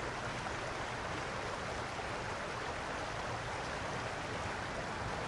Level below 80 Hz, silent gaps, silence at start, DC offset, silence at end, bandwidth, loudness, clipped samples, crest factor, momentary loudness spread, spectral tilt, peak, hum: -54 dBFS; none; 0 s; under 0.1%; 0 s; 11.5 kHz; -40 LUFS; under 0.1%; 14 dB; 1 LU; -4 dB/octave; -26 dBFS; none